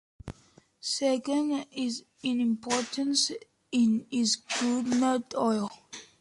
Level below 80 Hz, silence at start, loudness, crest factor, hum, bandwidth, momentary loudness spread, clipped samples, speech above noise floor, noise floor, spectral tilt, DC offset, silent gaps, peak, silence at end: -64 dBFS; 0.25 s; -29 LUFS; 16 dB; none; 11.5 kHz; 14 LU; under 0.1%; 32 dB; -61 dBFS; -3 dB/octave; under 0.1%; none; -12 dBFS; 0.15 s